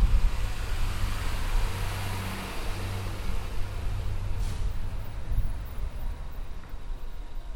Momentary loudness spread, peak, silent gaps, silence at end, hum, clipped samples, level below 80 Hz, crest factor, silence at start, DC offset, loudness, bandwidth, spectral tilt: 11 LU; -10 dBFS; none; 0 s; none; under 0.1%; -30 dBFS; 16 dB; 0 s; under 0.1%; -35 LUFS; 17 kHz; -5 dB/octave